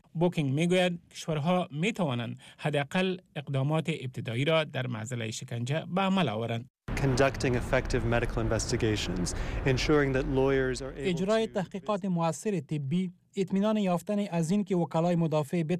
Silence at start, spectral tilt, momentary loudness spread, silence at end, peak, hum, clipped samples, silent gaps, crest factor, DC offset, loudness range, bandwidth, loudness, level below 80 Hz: 0.15 s; -6 dB/octave; 8 LU; 0 s; -16 dBFS; none; under 0.1%; 6.70-6.74 s; 14 dB; under 0.1%; 3 LU; 13.5 kHz; -29 LUFS; -44 dBFS